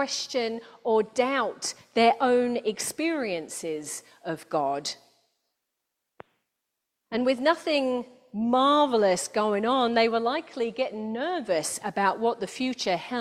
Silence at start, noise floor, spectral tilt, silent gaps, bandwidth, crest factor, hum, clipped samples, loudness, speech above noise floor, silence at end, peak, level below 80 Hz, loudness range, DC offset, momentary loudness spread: 0 s; -83 dBFS; -3 dB/octave; none; 15 kHz; 20 dB; none; under 0.1%; -26 LUFS; 57 dB; 0 s; -8 dBFS; -72 dBFS; 9 LU; under 0.1%; 11 LU